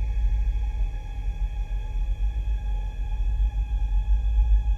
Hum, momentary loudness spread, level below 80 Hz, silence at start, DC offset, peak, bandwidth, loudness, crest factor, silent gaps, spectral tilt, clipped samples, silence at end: none; 8 LU; -24 dBFS; 0 s; under 0.1%; -12 dBFS; 3.6 kHz; -29 LUFS; 12 dB; none; -7 dB/octave; under 0.1%; 0 s